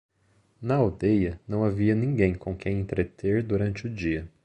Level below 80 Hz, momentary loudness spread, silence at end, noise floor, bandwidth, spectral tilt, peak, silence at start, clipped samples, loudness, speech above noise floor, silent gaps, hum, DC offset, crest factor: -44 dBFS; 6 LU; 0.15 s; -65 dBFS; 8.8 kHz; -9 dB/octave; -8 dBFS; 0.6 s; under 0.1%; -26 LUFS; 40 dB; none; none; under 0.1%; 18 dB